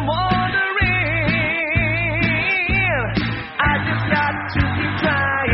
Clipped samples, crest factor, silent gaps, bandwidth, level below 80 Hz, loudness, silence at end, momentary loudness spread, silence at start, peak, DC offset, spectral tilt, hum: under 0.1%; 16 dB; none; 5.8 kHz; -34 dBFS; -18 LUFS; 0 s; 4 LU; 0 s; -2 dBFS; under 0.1%; -4 dB/octave; none